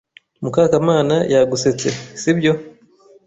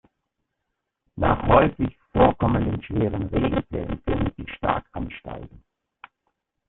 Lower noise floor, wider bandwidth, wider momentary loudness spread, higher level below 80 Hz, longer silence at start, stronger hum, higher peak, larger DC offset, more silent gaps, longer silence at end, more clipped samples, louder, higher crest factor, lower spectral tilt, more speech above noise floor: second, -50 dBFS vs -80 dBFS; first, 8.4 kHz vs 4.1 kHz; second, 8 LU vs 16 LU; second, -54 dBFS vs -38 dBFS; second, 0.4 s vs 1.15 s; neither; about the same, -2 dBFS vs -2 dBFS; neither; neither; second, 0.55 s vs 1.2 s; neither; first, -17 LUFS vs -23 LUFS; second, 16 dB vs 22 dB; second, -5.5 dB/octave vs -11.5 dB/octave; second, 34 dB vs 57 dB